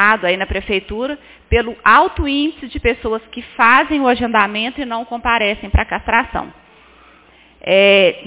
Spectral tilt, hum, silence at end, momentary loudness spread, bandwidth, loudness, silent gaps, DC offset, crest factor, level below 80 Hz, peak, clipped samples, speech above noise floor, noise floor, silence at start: -8.5 dB/octave; none; 0 s; 13 LU; 4 kHz; -15 LUFS; none; under 0.1%; 16 dB; -30 dBFS; 0 dBFS; under 0.1%; 32 dB; -48 dBFS; 0 s